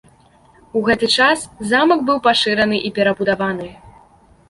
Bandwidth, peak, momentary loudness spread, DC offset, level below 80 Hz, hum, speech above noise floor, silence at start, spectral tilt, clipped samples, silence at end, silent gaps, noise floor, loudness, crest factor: 11.5 kHz; -2 dBFS; 9 LU; under 0.1%; -50 dBFS; none; 34 dB; 0.75 s; -4 dB/octave; under 0.1%; 0.6 s; none; -50 dBFS; -16 LUFS; 16 dB